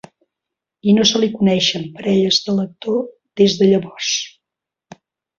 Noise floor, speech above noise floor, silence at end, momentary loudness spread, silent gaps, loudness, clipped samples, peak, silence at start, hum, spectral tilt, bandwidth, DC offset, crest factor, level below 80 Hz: -85 dBFS; 68 dB; 1.1 s; 10 LU; none; -16 LUFS; under 0.1%; -2 dBFS; 0.85 s; none; -4.5 dB/octave; 7.4 kHz; under 0.1%; 16 dB; -58 dBFS